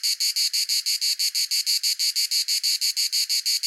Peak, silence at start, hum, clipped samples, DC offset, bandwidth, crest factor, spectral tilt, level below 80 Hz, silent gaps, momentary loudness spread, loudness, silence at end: -8 dBFS; 0 s; none; under 0.1%; under 0.1%; 17 kHz; 16 dB; 14 dB/octave; under -90 dBFS; none; 1 LU; -21 LUFS; 0 s